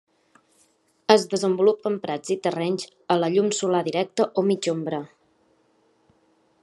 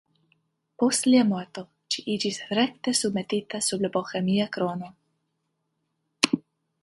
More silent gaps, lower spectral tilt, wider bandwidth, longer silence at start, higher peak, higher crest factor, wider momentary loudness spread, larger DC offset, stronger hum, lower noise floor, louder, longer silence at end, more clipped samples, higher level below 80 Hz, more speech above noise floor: neither; about the same, -5 dB/octave vs -4 dB/octave; about the same, 12 kHz vs 11.5 kHz; first, 1.1 s vs 0.8 s; about the same, 0 dBFS vs 0 dBFS; about the same, 24 dB vs 26 dB; about the same, 10 LU vs 11 LU; neither; neither; second, -64 dBFS vs -77 dBFS; about the same, -23 LUFS vs -25 LUFS; first, 1.55 s vs 0.45 s; neither; second, -76 dBFS vs -70 dBFS; second, 41 dB vs 52 dB